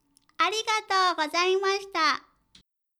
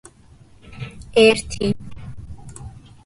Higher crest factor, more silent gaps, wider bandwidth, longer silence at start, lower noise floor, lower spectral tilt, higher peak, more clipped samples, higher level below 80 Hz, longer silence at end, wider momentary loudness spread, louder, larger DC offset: about the same, 18 dB vs 20 dB; neither; first, 14 kHz vs 11.5 kHz; second, 0.4 s vs 0.65 s; first, -62 dBFS vs -48 dBFS; second, 0 dB/octave vs -4.5 dB/octave; second, -10 dBFS vs -2 dBFS; neither; second, -74 dBFS vs -42 dBFS; first, 0.8 s vs 0.35 s; second, 4 LU vs 25 LU; second, -25 LUFS vs -18 LUFS; neither